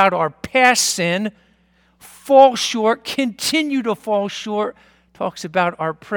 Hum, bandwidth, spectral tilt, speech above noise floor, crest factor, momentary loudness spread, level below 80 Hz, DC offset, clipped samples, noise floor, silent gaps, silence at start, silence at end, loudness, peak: none; 19 kHz; -3 dB/octave; 40 dB; 18 dB; 14 LU; -58 dBFS; under 0.1%; under 0.1%; -58 dBFS; none; 0 s; 0 s; -18 LUFS; 0 dBFS